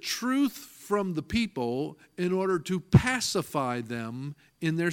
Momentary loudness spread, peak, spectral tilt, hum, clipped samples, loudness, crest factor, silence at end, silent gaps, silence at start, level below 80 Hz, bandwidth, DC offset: 13 LU; -6 dBFS; -5.5 dB/octave; none; under 0.1%; -29 LUFS; 22 dB; 0 s; none; 0.05 s; -50 dBFS; 17.5 kHz; under 0.1%